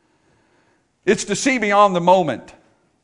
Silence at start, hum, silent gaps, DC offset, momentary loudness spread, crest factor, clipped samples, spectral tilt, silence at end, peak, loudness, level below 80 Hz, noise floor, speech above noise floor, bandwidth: 1.05 s; none; none; under 0.1%; 11 LU; 18 dB; under 0.1%; -4 dB/octave; 0.6 s; 0 dBFS; -17 LUFS; -58 dBFS; -61 dBFS; 45 dB; 11 kHz